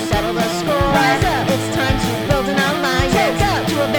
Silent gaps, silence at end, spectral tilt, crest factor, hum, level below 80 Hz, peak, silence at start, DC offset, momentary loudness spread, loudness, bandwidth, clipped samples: none; 0 s; -5 dB/octave; 14 dB; none; -30 dBFS; -2 dBFS; 0 s; under 0.1%; 4 LU; -17 LUFS; over 20 kHz; under 0.1%